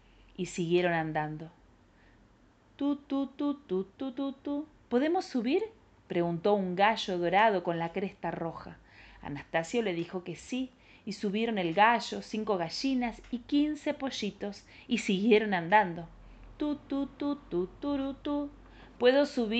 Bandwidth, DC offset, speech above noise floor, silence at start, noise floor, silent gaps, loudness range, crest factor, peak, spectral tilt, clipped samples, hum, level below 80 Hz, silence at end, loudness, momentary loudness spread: 9 kHz; under 0.1%; 32 dB; 0.4 s; -62 dBFS; none; 6 LU; 22 dB; -10 dBFS; -5.5 dB/octave; under 0.1%; none; -60 dBFS; 0 s; -31 LUFS; 16 LU